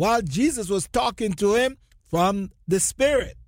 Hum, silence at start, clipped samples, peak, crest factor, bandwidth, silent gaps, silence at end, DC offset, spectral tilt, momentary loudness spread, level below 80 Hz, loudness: none; 0 s; under 0.1%; -8 dBFS; 14 dB; 16.5 kHz; none; 0.05 s; under 0.1%; -4 dB/octave; 5 LU; -44 dBFS; -23 LUFS